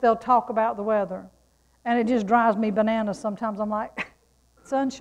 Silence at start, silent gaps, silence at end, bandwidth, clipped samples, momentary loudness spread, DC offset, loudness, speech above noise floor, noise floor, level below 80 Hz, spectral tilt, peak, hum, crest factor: 0 s; none; 0 s; 10.5 kHz; under 0.1%; 12 LU; under 0.1%; -24 LUFS; 39 dB; -62 dBFS; -60 dBFS; -6.5 dB/octave; -8 dBFS; none; 18 dB